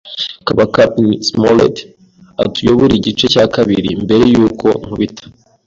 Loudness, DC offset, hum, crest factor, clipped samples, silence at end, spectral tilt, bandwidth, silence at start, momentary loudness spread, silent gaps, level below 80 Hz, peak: -12 LUFS; under 0.1%; none; 12 dB; under 0.1%; 0.35 s; -6 dB/octave; 7.8 kHz; 0.05 s; 9 LU; none; -40 dBFS; 0 dBFS